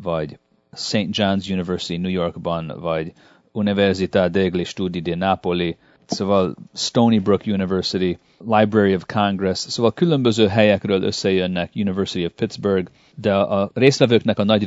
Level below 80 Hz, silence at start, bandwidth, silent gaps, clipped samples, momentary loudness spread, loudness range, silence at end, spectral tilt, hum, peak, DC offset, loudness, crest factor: -54 dBFS; 0 s; 8 kHz; none; under 0.1%; 9 LU; 4 LU; 0 s; -6 dB/octave; none; 0 dBFS; under 0.1%; -20 LUFS; 20 dB